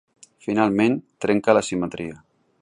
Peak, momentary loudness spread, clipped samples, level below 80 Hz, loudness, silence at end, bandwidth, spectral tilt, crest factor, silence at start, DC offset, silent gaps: -2 dBFS; 15 LU; under 0.1%; -58 dBFS; -21 LUFS; 0.45 s; 11 kHz; -5.5 dB/octave; 20 dB; 0.45 s; under 0.1%; none